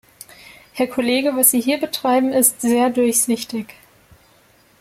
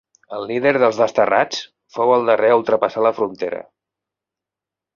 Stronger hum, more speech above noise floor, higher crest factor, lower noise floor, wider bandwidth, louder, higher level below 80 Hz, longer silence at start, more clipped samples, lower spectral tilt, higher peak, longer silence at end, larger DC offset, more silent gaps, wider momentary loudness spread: neither; second, 36 dB vs 70 dB; about the same, 18 dB vs 18 dB; second, -54 dBFS vs -87 dBFS; first, 16.5 kHz vs 7.2 kHz; about the same, -17 LUFS vs -17 LUFS; about the same, -60 dBFS vs -64 dBFS; first, 0.75 s vs 0.3 s; neither; second, -2 dB/octave vs -5 dB/octave; about the same, -2 dBFS vs -2 dBFS; second, 1.15 s vs 1.35 s; neither; neither; about the same, 13 LU vs 14 LU